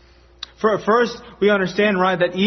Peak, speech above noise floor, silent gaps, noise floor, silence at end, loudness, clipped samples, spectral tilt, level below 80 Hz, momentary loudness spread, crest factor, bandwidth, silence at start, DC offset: -4 dBFS; 22 dB; none; -40 dBFS; 0 s; -18 LUFS; under 0.1%; -6 dB/octave; -52 dBFS; 8 LU; 14 dB; 6.4 kHz; 0.6 s; under 0.1%